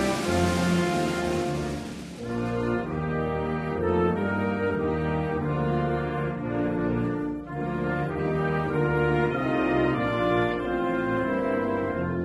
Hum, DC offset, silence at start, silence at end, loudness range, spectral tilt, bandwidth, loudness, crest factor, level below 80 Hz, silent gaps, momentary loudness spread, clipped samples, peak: none; under 0.1%; 0 s; 0 s; 3 LU; -6.5 dB/octave; 14 kHz; -26 LUFS; 14 dB; -44 dBFS; none; 5 LU; under 0.1%; -12 dBFS